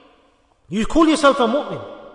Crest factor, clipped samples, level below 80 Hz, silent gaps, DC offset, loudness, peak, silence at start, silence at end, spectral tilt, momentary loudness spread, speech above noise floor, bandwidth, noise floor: 16 dB; under 0.1%; -38 dBFS; none; under 0.1%; -17 LUFS; -4 dBFS; 0.7 s; 0.05 s; -4.5 dB/octave; 15 LU; 41 dB; 11 kHz; -57 dBFS